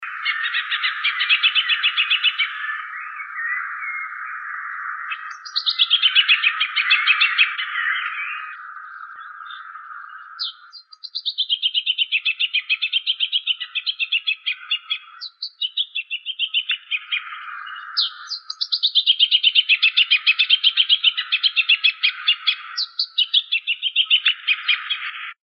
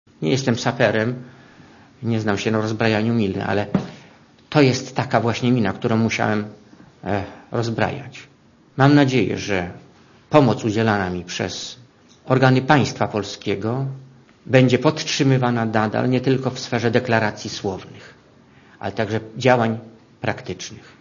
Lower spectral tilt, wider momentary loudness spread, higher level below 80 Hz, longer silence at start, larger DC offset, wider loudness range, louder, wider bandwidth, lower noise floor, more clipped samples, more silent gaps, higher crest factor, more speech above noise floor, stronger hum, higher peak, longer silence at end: second, 8.5 dB/octave vs -6 dB/octave; about the same, 17 LU vs 15 LU; second, under -90 dBFS vs -56 dBFS; second, 0 s vs 0.2 s; neither; first, 9 LU vs 4 LU; about the same, -18 LUFS vs -20 LUFS; about the same, 6.8 kHz vs 7.4 kHz; second, -44 dBFS vs -50 dBFS; neither; neither; about the same, 18 dB vs 20 dB; second, 24 dB vs 31 dB; neither; second, -4 dBFS vs 0 dBFS; about the same, 0.2 s vs 0.2 s